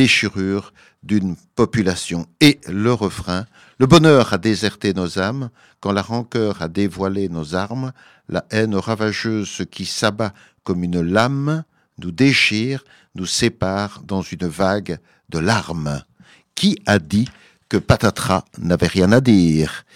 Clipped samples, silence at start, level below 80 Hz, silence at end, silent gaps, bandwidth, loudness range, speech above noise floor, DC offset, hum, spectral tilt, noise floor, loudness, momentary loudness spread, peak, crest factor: under 0.1%; 0 s; -44 dBFS; 0.15 s; none; 16 kHz; 6 LU; 33 dB; under 0.1%; none; -5.5 dB/octave; -51 dBFS; -19 LUFS; 13 LU; 0 dBFS; 18 dB